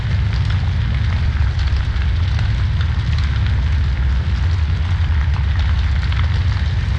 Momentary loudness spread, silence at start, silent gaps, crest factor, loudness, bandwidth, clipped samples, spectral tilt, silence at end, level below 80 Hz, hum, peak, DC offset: 1 LU; 0 s; none; 10 dB; -18 LUFS; 7 kHz; under 0.1%; -6.5 dB/octave; 0 s; -18 dBFS; none; -6 dBFS; under 0.1%